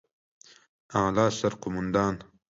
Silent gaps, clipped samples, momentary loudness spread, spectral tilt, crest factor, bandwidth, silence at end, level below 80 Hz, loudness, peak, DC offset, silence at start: none; under 0.1%; 8 LU; -5.5 dB/octave; 18 dB; 8 kHz; 0.3 s; -54 dBFS; -27 LUFS; -10 dBFS; under 0.1%; 0.9 s